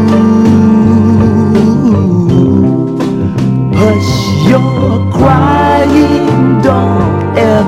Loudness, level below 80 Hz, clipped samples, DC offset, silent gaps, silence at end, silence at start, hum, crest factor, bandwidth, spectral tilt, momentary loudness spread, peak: -8 LUFS; -30 dBFS; 0.9%; under 0.1%; none; 0 s; 0 s; none; 8 dB; 13 kHz; -8 dB/octave; 5 LU; 0 dBFS